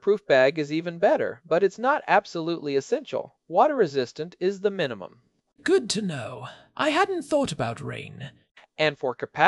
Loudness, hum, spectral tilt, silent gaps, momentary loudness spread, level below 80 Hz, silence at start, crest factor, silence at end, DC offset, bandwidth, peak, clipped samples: -25 LUFS; none; -4.5 dB/octave; none; 16 LU; -66 dBFS; 0.05 s; 24 dB; 0 s; under 0.1%; 12 kHz; -2 dBFS; under 0.1%